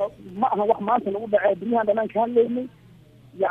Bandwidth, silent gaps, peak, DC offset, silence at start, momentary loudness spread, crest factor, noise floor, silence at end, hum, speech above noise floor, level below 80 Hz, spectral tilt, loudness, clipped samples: 4 kHz; none; -6 dBFS; under 0.1%; 0 s; 7 LU; 18 dB; -50 dBFS; 0 s; none; 28 dB; -62 dBFS; -8.5 dB/octave; -23 LUFS; under 0.1%